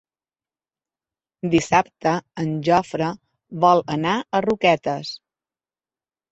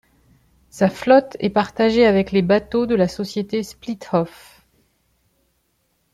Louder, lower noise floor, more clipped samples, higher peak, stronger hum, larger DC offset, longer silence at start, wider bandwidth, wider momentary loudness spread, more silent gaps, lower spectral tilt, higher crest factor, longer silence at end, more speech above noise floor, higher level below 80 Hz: about the same, -21 LUFS vs -19 LUFS; first, under -90 dBFS vs -67 dBFS; neither; about the same, -2 dBFS vs -2 dBFS; neither; neither; first, 1.45 s vs 0.75 s; second, 8.2 kHz vs 13.5 kHz; about the same, 13 LU vs 11 LU; neither; about the same, -5.5 dB/octave vs -6.5 dB/octave; about the same, 20 dB vs 18 dB; second, 1.15 s vs 1.85 s; first, over 70 dB vs 49 dB; second, -58 dBFS vs -50 dBFS